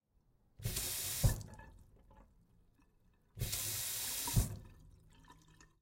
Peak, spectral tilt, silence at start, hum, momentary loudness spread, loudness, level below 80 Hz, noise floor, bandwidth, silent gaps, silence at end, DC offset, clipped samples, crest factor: -16 dBFS; -3 dB/octave; 0.6 s; none; 18 LU; -38 LUFS; -48 dBFS; -73 dBFS; 16.5 kHz; none; 0.15 s; under 0.1%; under 0.1%; 24 dB